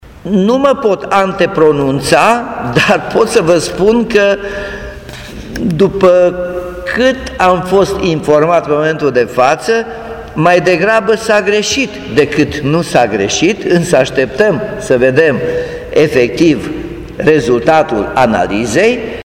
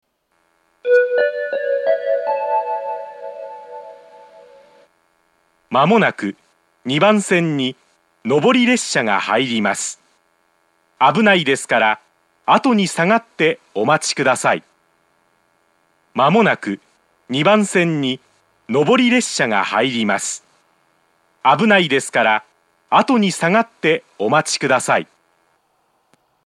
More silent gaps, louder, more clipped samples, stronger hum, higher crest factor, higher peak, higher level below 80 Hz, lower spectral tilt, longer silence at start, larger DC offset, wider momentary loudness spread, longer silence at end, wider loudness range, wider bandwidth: neither; first, -11 LUFS vs -17 LUFS; first, 0.3% vs under 0.1%; neither; second, 12 dB vs 18 dB; about the same, 0 dBFS vs 0 dBFS; first, -36 dBFS vs -76 dBFS; about the same, -5 dB/octave vs -4 dB/octave; second, 0.05 s vs 0.85 s; neither; second, 10 LU vs 14 LU; second, 0 s vs 1.4 s; second, 2 LU vs 5 LU; first, 16.5 kHz vs 13 kHz